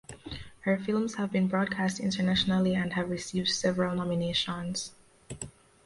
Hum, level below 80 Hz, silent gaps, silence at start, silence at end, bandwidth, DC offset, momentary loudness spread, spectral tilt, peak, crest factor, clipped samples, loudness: none; -56 dBFS; none; 0.1 s; 0.35 s; 11.5 kHz; under 0.1%; 15 LU; -5 dB/octave; -14 dBFS; 16 dB; under 0.1%; -29 LUFS